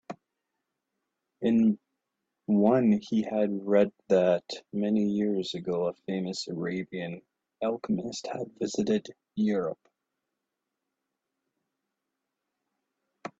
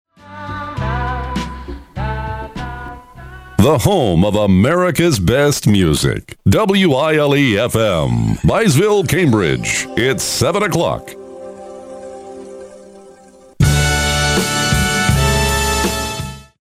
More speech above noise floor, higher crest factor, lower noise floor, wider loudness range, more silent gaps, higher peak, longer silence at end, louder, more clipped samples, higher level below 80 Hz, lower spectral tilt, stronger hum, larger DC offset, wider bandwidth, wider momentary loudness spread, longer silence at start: first, 58 dB vs 29 dB; about the same, 20 dB vs 16 dB; first, -85 dBFS vs -43 dBFS; about the same, 8 LU vs 8 LU; neither; second, -10 dBFS vs 0 dBFS; about the same, 0.1 s vs 0.2 s; second, -28 LUFS vs -15 LUFS; neither; second, -70 dBFS vs -28 dBFS; first, -6.5 dB/octave vs -5 dB/octave; neither; neither; second, 8 kHz vs 16 kHz; second, 13 LU vs 19 LU; second, 0.1 s vs 0.25 s